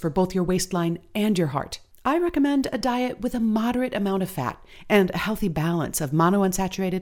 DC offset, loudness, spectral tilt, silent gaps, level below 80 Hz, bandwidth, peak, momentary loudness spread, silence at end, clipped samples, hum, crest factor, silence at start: under 0.1%; -24 LUFS; -5.5 dB/octave; none; -46 dBFS; 19.5 kHz; -6 dBFS; 7 LU; 0 s; under 0.1%; none; 18 dB; 0 s